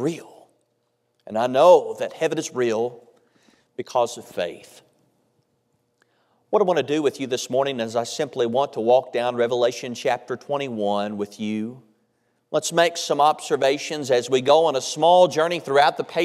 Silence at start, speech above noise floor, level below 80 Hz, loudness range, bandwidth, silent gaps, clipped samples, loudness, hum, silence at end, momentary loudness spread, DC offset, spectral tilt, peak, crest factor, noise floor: 0 s; 50 dB; -78 dBFS; 9 LU; 14 kHz; none; under 0.1%; -21 LUFS; none; 0 s; 12 LU; under 0.1%; -4 dB/octave; -2 dBFS; 20 dB; -71 dBFS